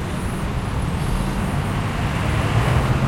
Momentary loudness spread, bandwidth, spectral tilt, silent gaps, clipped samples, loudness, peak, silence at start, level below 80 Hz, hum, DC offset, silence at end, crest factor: 6 LU; 16.5 kHz; -6.5 dB/octave; none; under 0.1%; -22 LUFS; -6 dBFS; 0 s; -28 dBFS; none; under 0.1%; 0 s; 16 dB